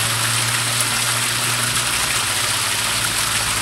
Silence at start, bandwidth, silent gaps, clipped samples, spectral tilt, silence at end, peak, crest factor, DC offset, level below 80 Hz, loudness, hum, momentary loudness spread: 0 s; 16 kHz; none; under 0.1%; -1 dB/octave; 0 s; -2 dBFS; 18 dB; under 0.1%; -44 dBFS; -17 LUFS; none; 1 LU